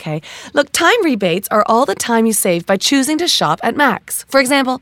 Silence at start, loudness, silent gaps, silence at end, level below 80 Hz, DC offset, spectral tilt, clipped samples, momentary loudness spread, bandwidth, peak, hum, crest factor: 0 s; -14 LUFS; none; 0.05 s; -58 dBFS; under 0.1%; -3 dB/octave; under 0.1%; 5 LU; 18 kHz; 0 dBFS; none; 14 dB